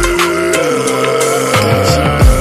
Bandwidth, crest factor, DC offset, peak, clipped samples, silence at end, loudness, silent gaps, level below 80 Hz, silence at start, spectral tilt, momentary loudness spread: 15 kHz; 10 dB; under 0.1%; 0 dBFS; under 0.1%; 0 s; -11 LUFS; none; -18 dBFS; 0 s; -4.5 dB/octave; 2 LU